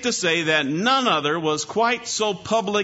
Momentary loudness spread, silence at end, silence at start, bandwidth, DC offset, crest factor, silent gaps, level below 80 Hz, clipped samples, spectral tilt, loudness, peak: 5 LU; 0 s; 0 s; 8 kHz; under 0.1%; 16 dB; none; -64 dBFS; under 0.1%; -3 dB/octave; -21 LUFS; -6 dBFS